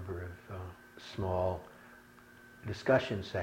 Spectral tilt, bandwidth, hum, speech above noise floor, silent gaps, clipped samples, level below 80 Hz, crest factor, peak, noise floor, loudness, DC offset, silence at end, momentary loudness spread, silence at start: -6.5 dB/octave; 16.5 kHz; none; 24 dB; none; under 0.1%; -58 dBFS; 22 dB; -16 dBFS; -57 dBFS; -35 LUFS; under 0.1%; 0 s; 26 LU; 0 s